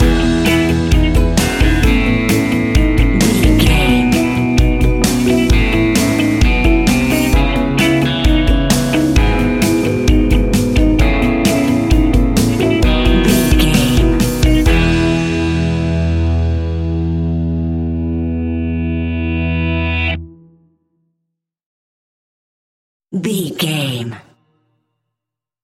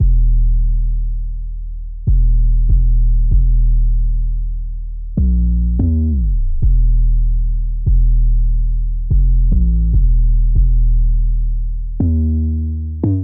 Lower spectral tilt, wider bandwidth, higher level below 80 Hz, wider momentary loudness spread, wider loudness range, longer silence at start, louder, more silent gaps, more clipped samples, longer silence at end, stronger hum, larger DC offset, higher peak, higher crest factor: second, -5.5 dB/octave vs -16 dB/octave; first, 16.5 kHz vs 0.9 kHz; second, -18 dBFS vs -12 dBFS; about the same, 7 LU vs 9 LU; first, 10 LU vs 2 LU; about the same, 0 s vs 0 s; first, -14 LUFS vs -18 LUFS; first, 21.66-23.00 s vs none; neither; first, 1.45 s vs 0 s; neither; neither; first, 0 dBFS vs -4 dBFS; about the same, 14 dB vs 10 dB